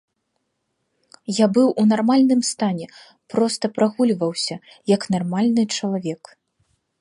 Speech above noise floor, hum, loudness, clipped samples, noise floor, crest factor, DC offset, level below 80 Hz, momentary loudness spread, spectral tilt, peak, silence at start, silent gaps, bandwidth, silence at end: 54 dB; none; -20 LUFS; under 0.1%; -74 dBFS; 18 dB; under 0.1%; -68 dBFS; 14 LU; -5 dB/octave; -4 dBFS; 1.3 s; none; 11.5 kHz; 0.85 s